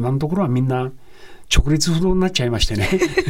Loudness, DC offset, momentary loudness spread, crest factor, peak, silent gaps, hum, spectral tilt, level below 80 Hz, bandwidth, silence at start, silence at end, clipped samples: -19 LUFS; under 0.1%; 4 LU; 14 dB; -4 dBFS; none; none; -5 dB/octave; -26 dBFS; 16.5 kHz; 0 s; 0 s; under 0.1%